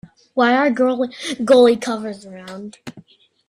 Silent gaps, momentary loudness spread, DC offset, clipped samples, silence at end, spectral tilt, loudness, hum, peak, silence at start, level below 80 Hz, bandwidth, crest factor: none; 22 LU; under 0.1%; under 0.1%; 0.5 s; -4.5 dB/octave; -17 LUFS; none; -2 dBFS; 0.35 s; -62 dBFS; 11.5 kHz; 16 dB